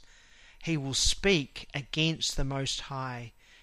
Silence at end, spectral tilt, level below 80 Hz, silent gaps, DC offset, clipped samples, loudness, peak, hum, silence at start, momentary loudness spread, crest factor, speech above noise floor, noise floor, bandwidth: 0.35 s; -3.5 dB/octave; -42 dBFS; none; under 0.1%; under 0.1%; -30 LUFS; -12 dBFS; none; 0 s; 13 LU; 20 dB; 25 dB; -56 dBFS; 15 kHz